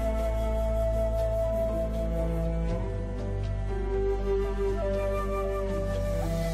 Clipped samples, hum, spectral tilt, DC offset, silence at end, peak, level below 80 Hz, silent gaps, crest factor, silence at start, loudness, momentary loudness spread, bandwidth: under 0.1%; none; -7.5 dB/octave; under 0.1%; 0 s; -18 dBFS; -32 dBFS; none; 10 dB; 0 s; -30 LUFS; 4 LU; 13 kHz